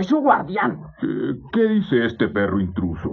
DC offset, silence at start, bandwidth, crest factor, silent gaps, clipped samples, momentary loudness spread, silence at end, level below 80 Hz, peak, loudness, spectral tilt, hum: under 0.1%; 0 s; 7 kHz; 16 dB; none; under 0.1%; 8 LU; 0 s; -50 dBFS; -4 dBFS; -21 LUFS; -8.5 dB/octave; none